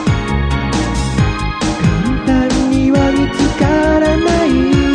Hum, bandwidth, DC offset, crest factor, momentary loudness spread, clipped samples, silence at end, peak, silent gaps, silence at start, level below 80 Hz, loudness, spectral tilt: none; 10.5 kHz; under 0.1%; 12 dB; 5 LU; under 0.1%; 0 s; -2 dBFS; none; 0 s; -22 dBFS; -14 LUFS; -6 dB/octave